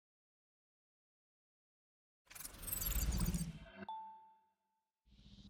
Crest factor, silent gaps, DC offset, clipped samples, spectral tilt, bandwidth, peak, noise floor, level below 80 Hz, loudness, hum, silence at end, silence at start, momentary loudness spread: 22 dB; none; under 0.1%; under 0.1%; -4 dB/octave; 19 kHz; -26 dBFS; -89 dBFS; -50 dBFS; -43 LUFS; none; 0 s; 2.3 s; 18 LU